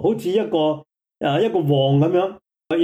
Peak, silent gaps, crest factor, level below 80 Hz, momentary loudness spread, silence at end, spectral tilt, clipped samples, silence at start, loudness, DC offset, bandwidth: -8 dBFS; none; 12 dB; -62 dBFS; 9 LU; 0 s; -8 dB/octave; under 0.1%; 0 s; -20 LUFS; under 0.1%; 13 kHz